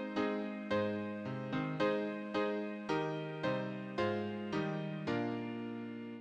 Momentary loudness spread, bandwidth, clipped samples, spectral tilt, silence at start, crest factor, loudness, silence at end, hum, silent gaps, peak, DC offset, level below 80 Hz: 6 LU; 9.4 kHz; under 0.1%; -7 dB/octave; 0 s; 16 dB; -38 LUFS; 0 s; none; none; -20 dBFS; under 0.1%; -72 dBFS